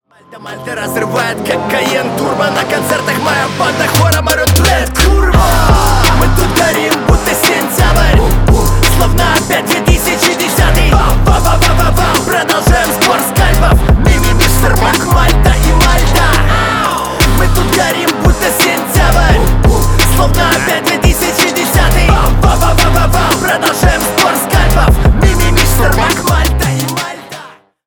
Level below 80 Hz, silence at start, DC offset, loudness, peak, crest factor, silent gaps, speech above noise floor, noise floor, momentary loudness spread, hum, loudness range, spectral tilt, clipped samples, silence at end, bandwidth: -14 dBFS; 0.3 s; under 0.1%; -10 LUFS; 0 dBFS; 10 dB; none; 21 dB; -34 dBFS; 4 LU; none; 1 LU; -4.5 dB/octave; under 0.1%; 0.4 s; over 20 kHz